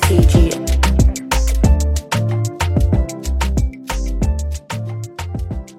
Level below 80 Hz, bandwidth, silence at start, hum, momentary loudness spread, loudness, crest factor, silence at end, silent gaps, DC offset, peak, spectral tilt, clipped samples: -18 dBFS; 16 kHz; 0 s; none; 11 LU; -18 LUFS; 16 dB; 0.05 s; none; under 0.1%; 0 dBFS; -5.5 dB/octave; under 0.1%